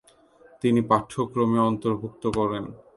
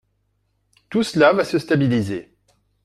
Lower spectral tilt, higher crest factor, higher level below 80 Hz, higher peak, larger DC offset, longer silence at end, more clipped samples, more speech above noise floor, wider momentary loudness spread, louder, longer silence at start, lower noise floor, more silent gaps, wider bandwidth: about the same, -7.5 dB/octave vs -6.5 dB/octave; about the same, 20 dB vs 20 dB; about the same, -56 dBFS vs -58 dBFS; about the same, -4 dBFS vs -2 dBFS; neither; second, 0.2 s vs 0.65 s; neither; second, 31 dB vs 50 dB; second, 7 LU vs 11 LU; second, -25 LUFS vs -19 LUFS; second, 0.65 s vs 0.9 s; second, -55 dBFS vs -68 dBFS; neither; second, 11.5 kHz vs 14 kHz